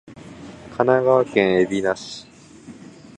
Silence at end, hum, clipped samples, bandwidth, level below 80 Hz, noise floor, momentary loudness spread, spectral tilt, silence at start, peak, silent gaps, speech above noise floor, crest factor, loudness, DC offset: 0.45 s; none; under 0.1%; 9.4 kHz; -56 dBFS; -43 dBFS; 23 LU; -6 dB/octave; 0.1 s; -2 dBFS; none; 24 dB; 20 dB; -19 LUFS; under 0.1%